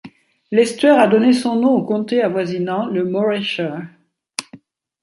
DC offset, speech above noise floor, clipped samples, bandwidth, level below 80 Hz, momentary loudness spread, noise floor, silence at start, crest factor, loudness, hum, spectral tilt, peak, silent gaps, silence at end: under 0.1%; 29 dB; under 0.1%; 11.5 kHz; -66 dBFS; 16 LU; -45 dBFS; 0.05 s; 16 dB; -17 LUFS; none; -5.5 dB/octave; -2 dBFS; none; 0.45 s